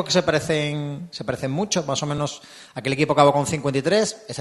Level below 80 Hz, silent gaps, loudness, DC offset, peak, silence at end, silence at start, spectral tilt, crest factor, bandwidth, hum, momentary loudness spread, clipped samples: -54 dBFS; none; -22 LUFS; under 0.1%; -2 dBFS; 0 s; 0 s; -4.5 dB/octave; 20 dB; 12.5 kHz; none; 13 LU; under 0.1%